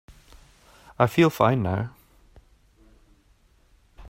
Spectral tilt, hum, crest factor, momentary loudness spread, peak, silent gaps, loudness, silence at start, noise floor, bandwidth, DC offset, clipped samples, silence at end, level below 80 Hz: -7 dB/octave; none; 24 dB; 11 LU; -4 dBFS; none; -23 LUFS; 1 s; -60 dBFS; 16 kHz; under 0.1%; under 0.1%; 0 s; -54 dBFS